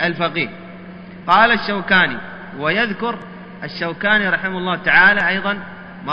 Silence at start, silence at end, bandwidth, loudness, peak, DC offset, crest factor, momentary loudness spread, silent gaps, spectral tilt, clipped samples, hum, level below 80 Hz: 0 s; 0 s; 7.4 kHz; -16 LUFS; 0 dBFS; under 0.1%; 18 dB; 21 LU; none; -6.5 dB/octave; under 0.1%; none; -48 dBFS